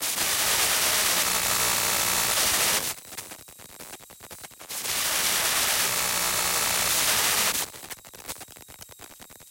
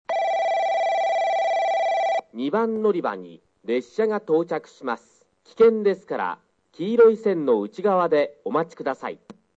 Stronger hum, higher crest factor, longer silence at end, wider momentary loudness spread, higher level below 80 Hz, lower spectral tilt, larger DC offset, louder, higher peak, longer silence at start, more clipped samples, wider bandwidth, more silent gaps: neither; about the same, 18 dB vs 16 dB; second, 0.05 s vs 0.25 s; first, 22 LU vs 13 LU; first, -54 dBFS vs -72 dBFS; second, 0.5 dB/octave vs -6 dB/octave; neither; about the same, -22 LUFS vs -23 LUFS; second, -10 dBFS vs -6 dBFS; about the same, 0 s vs 0.1 s; neither; first, 17 kHz vs 7.8 kHz; neither